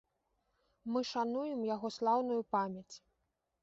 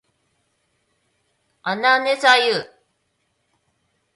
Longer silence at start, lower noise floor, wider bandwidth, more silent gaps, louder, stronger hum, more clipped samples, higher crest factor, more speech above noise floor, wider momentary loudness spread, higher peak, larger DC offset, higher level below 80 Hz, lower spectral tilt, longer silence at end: second, 0.85 s vs 1.65 s; first, -84 dBFS vs -70 dBFS; second, 7.6 kHz vs 11.5 kHz; neither; second, -36 LUFS vs -17 LUFS; neither; neither; about the same, 18 dB vs 22 dB; second, 48 dB vs 53 dB; about the same, 16 LU vs 15 LU; second, -20 dBFS vs -2 dBFS; neither; about the same, -78 dBFS vs -74 dBFS; first, -4.5 dB/octave vs -2 dB/octave; second, 0.65 s vs 1.5 s